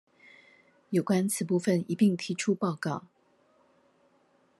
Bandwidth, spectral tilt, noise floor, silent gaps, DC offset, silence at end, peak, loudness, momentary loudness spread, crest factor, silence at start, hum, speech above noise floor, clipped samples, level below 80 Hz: 12.5 kHz; -5.5 dB/octave; -67 dBFS; none; under 0.1%; 1.6 s; -12 dBFS; -29 LUFS; 7 LU; 18 dB; 0.9 s; none; 39 dB; under 0.1%; -78 dBFS